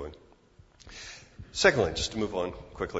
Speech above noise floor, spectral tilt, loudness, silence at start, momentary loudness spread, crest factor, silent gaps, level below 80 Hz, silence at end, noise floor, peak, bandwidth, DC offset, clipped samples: 30 dB; -3.5 dB/octave; -28 LUFS; 0 s; 21 LU; 26 dB; none; -50 dBFS; 0 s; -58 dBFS; -6 dBFS; 8 kHz; under 0.1%; under 0.1%